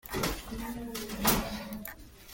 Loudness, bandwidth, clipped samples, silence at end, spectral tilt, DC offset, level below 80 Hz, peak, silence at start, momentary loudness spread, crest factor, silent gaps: -33 LUFS; 17 kHz; under 0.1%; 0 s; -3.5 dB/octave; under 0.1%; -46 dBFS; -10 dBFS; 0.05 s; 15 LU; 24 dB; none